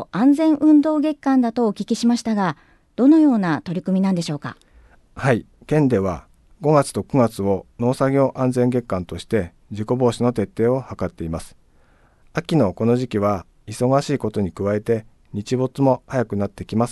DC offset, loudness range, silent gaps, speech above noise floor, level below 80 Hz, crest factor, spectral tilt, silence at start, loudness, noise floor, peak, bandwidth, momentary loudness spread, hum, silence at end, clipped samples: under 0.1%; 4 LU; none; 35 dB; -46 dBFS; 16 dB; -7 dB/octave; 0 s; -20 LUFS; -54 dBFS; -4 dBFS; 12.5 kHz; 13 LU; none; 0 s; under 0.1%